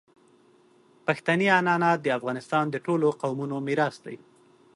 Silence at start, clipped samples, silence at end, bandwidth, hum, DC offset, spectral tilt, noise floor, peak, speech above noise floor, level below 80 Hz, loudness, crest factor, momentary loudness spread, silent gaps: 1.05 s; under 0.1%; 0.6 s; 11.5 kHz; none; under 0.1%; -6 dB/octave; -59 dBFS; -8 dBFS; 34 dB; -74 dBFS; -25 LUFS; 20 dB; 11 LU; none